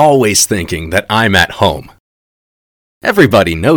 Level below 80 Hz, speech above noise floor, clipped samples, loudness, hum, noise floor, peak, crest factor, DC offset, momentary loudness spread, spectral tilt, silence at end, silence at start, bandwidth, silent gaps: -36 dBFS; over 80 dB; 1%; -11 LUFS; none; under -90 dBFS; 0 dBFS; 12 dB; under 0.1%; 8 LU; -4 dB/octave; 0 s; 0 s; over 20 kHz; 2.00-3.01 s